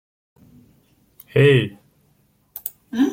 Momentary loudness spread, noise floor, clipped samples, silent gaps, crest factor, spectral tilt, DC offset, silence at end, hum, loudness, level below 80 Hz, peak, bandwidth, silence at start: 17 LU; -61 dBFS; under 0.1%; none; 20 dB; -7 dB/octave; under 0.1%; 0 s; none; -19 LUFS; -58 dBFS; -4 dBFS; 17 kHz; 1.35 s